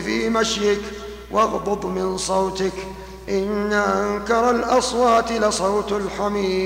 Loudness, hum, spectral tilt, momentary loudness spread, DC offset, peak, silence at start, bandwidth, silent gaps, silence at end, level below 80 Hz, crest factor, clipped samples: -21 LUFS; none; -4 dB/octave; 8 LU; under 0.1%; -4 dBFS; 0 s; 16 kHz; none; 0 s; -42 dBFS; 16 dB; under 0.1%